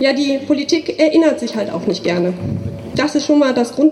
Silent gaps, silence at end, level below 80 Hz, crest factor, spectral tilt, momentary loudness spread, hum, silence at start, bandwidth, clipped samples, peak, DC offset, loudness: none; 0 s; -48 dBFS; 14 dB; -5.5 dB/octave; 9 LU; none; 0 s; 12 kHz; under 0.1%; -2 dBFS; under 0.1%; -16 LUFS